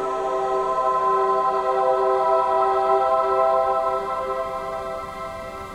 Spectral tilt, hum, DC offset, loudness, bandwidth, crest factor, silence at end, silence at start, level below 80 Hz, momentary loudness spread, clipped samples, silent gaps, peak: -5 dB/octave; none; under 0.1%; -21 LUFS; 13.5 kHz; 14 dB; 0 s; 0 s; -52 dBFS; 11 LU; under 0.1%; none; -6 dBFS